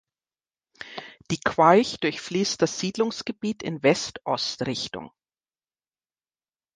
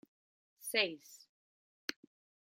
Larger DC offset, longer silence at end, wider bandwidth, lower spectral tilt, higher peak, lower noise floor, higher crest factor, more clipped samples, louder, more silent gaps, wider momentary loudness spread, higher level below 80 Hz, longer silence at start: neither; first, 1.65 s vs 0.6 s; second, 10 kHz vs 16.5 kHz; first, -4 dB/octave vs -1 dB/octave; first, -2 dBFS vs -16 dBFS; about the same, under -90 dBFS vs under -90 dBFS; about the same, 24 dB vs 28 dB; neither; first, -24 LUFS vs -37 LUFS; second, none vs 1.29-1.88 s; second, 20 LU vs 23 LU; first, -62 dBFS vs under -90 dBFS; first, 0.8 s vs 0.6 s